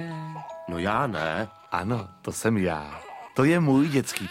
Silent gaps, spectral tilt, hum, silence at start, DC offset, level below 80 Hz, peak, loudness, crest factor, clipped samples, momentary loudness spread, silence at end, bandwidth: none; -6 dB/octave; none; 0 s; under 0.1%; -56 dBFS; -6 dBFS; -26 LUFS; 20 dB; under 0.1%; 15 LU; 0 s; 16.5 kHz